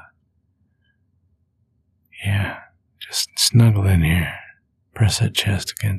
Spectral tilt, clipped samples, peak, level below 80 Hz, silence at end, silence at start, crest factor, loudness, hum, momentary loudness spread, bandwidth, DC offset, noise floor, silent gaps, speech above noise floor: -4.5 dB/octave; under 0.1%; -2 dBFS; -38 dBFS; 0 s; 2.15 s; 18 dB; -19 LUFS; none; 14 LU; 15 kHz; under 0.1%; -66 dBFS; none; 49 dB